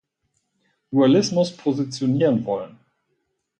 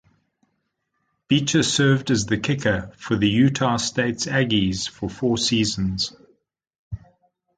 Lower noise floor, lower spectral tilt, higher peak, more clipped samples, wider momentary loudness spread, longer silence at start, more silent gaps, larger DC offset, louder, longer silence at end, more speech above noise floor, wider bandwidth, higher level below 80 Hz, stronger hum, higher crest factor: about the same, -73 dBFS vs -74 dBFS; first, -6.5 dB/octave vs -4.5 dB/octave; about the same, -6 dBFS vs -6 dBFS; neither; about the same, 11 LU vs 9 LU; second, 0.9 s vs 1.3 s; second, none vs 6.79-6.91 s; neither; about the same, -21 LUFS vs -21 LUFS; first, 0.9 s vs 0.6 s; about the same, 54 dB vs 53 dB; about the same, 9.2 kHz vs 9.4 kHz; second, -64 dBFS vs -46 dBFS; neither; about the same, 16 dB vs 18 dB